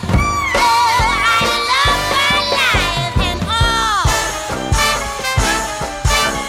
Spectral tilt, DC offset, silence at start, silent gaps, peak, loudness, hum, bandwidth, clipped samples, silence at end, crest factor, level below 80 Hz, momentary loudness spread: -3 dB/octave; under 0.1%; 0 s; none; -2 dBFS; -14 LUFS; none; 16.5 kHz; under 0.1%; 0 s; 12 dB; -26 dBFS; 6 LU